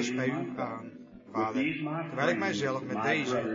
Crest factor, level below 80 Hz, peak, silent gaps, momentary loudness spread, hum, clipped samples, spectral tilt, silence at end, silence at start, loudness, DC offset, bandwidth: 18 dB; -72 dBFS; -14 dBFS; none; 10 LU; none; under 0.1%; -5.5 dB/octave; 0 s; 0 s; -31 LUFS; under 0.1%; 7.6 kHz